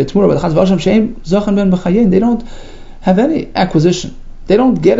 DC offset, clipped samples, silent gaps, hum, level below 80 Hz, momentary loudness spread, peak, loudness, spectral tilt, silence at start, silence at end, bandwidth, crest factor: under 0.1%; under 0.1%; none; none; -30 dBFS; 5 LU; 0 dBFS; -13 LUFS; -7 dB/octave; 0 s; 0 s; 7.8 kHz; 12 dB